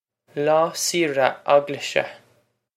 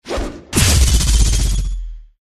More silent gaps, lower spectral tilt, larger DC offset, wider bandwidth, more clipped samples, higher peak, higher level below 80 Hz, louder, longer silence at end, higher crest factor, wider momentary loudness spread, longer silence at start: neither; about the same, -3 dB/octave vs -3.5 dB/octave; neither; first, 16 kHz vs 13.5 kHz; neither; about the same, -2 dBFS vs 0 dBFS; second, -74 dBFS vs -16 dBFS; second, -21 LUFS vs -16 LUFS; first, 0.6 s vs 0.2 s; first, 22 dB vs 14 dB; second, 6 LU vs 15 LU; first, 0.35 s vs 0.05 s